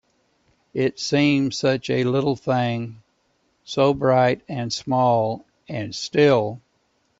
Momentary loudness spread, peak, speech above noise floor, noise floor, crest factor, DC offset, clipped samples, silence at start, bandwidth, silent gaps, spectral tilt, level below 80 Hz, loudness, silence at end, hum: 13 LU; -4 dBFS; 46 dB; -67 dBFS; 18 dB; under 0.1%; under 0.1%; 0.75 s; 8 kHz; none; -6 dB/octave; -58 dBFS; -21 LUFS; 0.65 s; none